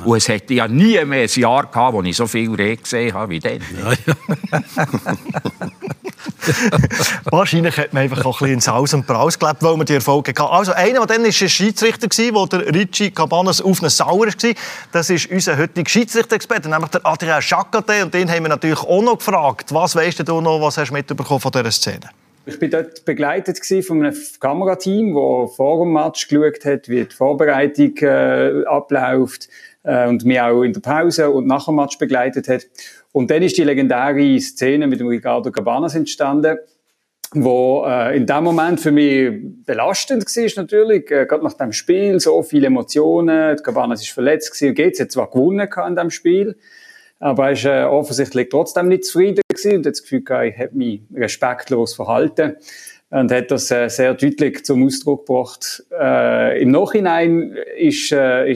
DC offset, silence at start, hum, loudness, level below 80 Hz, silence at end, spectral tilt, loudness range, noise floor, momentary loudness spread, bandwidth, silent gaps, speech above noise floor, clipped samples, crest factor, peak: under 0.1%; 0 s; none; -16 LUFS; -54 dBFS; 0 s; -4.5 dB/octave; 4 LU; -49 dBFS; 7 LU; 15.5 kHz; 49.44-49.49 s; 33 dB; under 0.1%; 16 dB; 0 dBFS